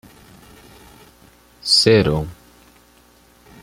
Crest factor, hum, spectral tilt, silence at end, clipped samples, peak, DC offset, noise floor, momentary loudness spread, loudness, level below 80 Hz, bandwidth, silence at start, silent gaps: 22 dB; none; -4 dB/octave; 1.3 s; under 0.1%; 0 dBFS; under 0.1%; -52 dBFS; 18 LU; -15 LUFS; -44 dBFS; 16 kHz; 1.65 s; none